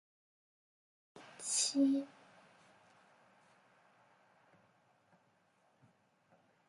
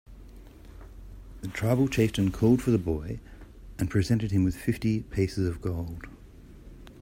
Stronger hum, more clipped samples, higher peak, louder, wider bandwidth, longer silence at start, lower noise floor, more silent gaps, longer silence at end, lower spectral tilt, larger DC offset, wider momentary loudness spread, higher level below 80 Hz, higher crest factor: neither; neither; second, -22 dBFS vs -10 dBFS; second, -34 LUFS vs -27 LUFS; second, 11 kHz vs 16 kHz; first, 1.15 s vs 0.1 s; first, -74 dBFS vs -49 dBFS; neither; first, 4.6 s vs 0 s; second, -1.5 dB/octave vs -7 dB/octave; neither; first, 26 LU vs 23 LU; second, under -90 dBFS vs -44 dBFS; about the same, 22 dB vs 18 dB